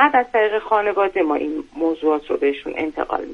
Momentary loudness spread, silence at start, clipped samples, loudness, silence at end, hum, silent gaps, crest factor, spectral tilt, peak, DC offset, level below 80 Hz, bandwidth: 7 LU; 0 s; under 0.1%; -20 LUFS; 0 s; none; none; 18 dB; -5.5 dB/octave; 0 dBFS; under 0.1%; -54 dBFS; 6.8 kHz